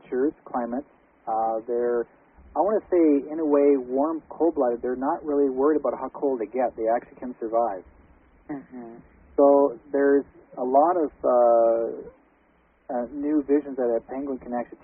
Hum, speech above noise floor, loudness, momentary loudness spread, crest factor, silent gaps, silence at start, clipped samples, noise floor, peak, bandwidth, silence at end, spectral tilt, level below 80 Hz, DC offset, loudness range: none; 39 dB; -24 LUFS; 14 LU; 18 dB; none; 0.1 s; under 0.1%; -62 dBFS; -6 dBFS; 2.8 kHz; 0.2 s; -1.5 dB/octave; -60 dBFS; under 0.1%; 5 LU